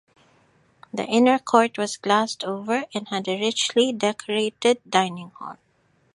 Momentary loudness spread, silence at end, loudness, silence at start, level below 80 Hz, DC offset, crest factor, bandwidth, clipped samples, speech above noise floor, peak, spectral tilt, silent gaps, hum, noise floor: 13 LU; 0.6 s; -22 LUFS; 0.95 s; -72 dBFS; under 0.1%; 22 dB; 11.5 kHz; under 0.1%; 42 dB; -2 dBFS; -3.5 dB/octave; none; none; -64 dBFS